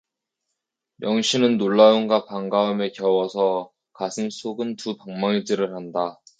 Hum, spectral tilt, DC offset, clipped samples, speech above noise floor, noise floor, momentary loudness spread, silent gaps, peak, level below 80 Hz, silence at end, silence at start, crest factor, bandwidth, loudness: none; -5 dB/octave; under 0.1%; under 0.1%; 60 dB; -81 dBFS; 14 LU; none; -2 dBFS; -72 dBFS; 0.25 s; 1 s; 20 dB; 9.2 kHz; -22 LUFS